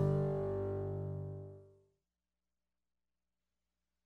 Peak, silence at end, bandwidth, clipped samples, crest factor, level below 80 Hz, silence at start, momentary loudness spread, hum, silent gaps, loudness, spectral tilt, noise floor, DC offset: -24 dBFS; 2.4 s; 4.4 kHz; under 0.1%; 18 dB; -62 dBFS; 0 s; 17 LU; none; none; -39 LUFS; -11 dB/octave; under -90 dBFS; under 0.1%